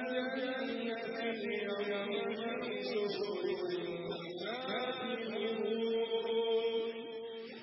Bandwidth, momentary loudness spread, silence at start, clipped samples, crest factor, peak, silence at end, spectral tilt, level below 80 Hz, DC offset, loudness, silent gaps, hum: 5.8 kHz; 7 LU; 0 s; under 0.1%; 14 dB; -24 dBFS; 0 s; -8 dB/octave; -82 dBFS; under 0.1%; -37 LUFS; none; none